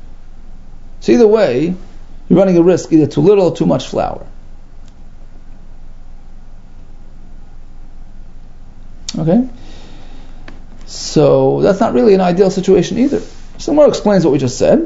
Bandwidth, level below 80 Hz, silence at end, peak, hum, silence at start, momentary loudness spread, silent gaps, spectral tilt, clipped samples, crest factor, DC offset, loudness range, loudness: 8 kHz; -32 dBFS; 0 s; 0 dBFS; none; 0 s; 13 LU; none; -6.5 dB/octave; under 0.1%; 14 dB; under 0.1%; 10 LU; -12 LUFS